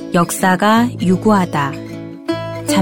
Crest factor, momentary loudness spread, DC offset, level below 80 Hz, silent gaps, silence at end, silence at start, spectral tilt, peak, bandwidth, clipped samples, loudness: 14 dB; 13 LU; under 0.1%; -50 dBFS; none; 0 s; 0 s; -5.5 dB/octave; 0 dBFS; 17.5 kHz; under 0.1%; -15 LUFS